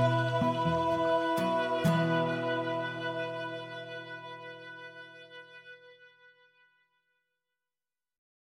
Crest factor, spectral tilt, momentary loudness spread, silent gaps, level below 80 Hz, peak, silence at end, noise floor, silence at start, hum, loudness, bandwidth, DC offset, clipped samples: 18 dB; -6.5 dB/octave; 21 LU; none; -64 dBFS; -16 dBFS; 2.4 s; under -90 dBFS; 0 s; none; -31 LUFS; 16 kHz; under 0.1%; under 0.1%